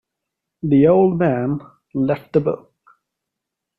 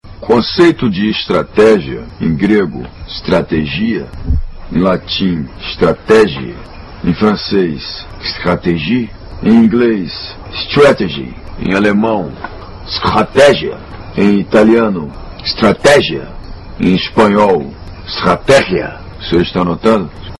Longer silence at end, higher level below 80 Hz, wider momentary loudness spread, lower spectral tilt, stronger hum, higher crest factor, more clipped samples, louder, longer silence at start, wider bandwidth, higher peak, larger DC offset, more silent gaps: first, 1.2 s vs 0.05 s; second, -52 dBFS vs -30 dBFS; about the same, 15 LU vs 16 LU; first, -11 dB/octave vs -6 dB/octave; neither; about the same, 16 dB vs 12 dB; neither; second, -18 LUFS vs -12 LUFS; first, 0.65 s vs 0.05 s; second, 4.5 kHz vs 11.5 kHz; second, -4 dBFS vs 0 dBFS; neither; neither